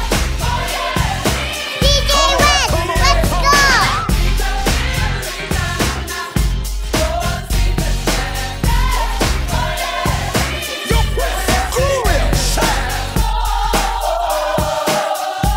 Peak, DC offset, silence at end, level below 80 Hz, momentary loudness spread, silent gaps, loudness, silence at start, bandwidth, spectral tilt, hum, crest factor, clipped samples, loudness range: 0 dBFS; under 0.1%; 0 s; -20 dBFS; 8 LU; none; -16 LUFS; 0 s; 16.5 kHz; -3.5 dB/octave; none; 16 dB; under 0.1%; 6 LU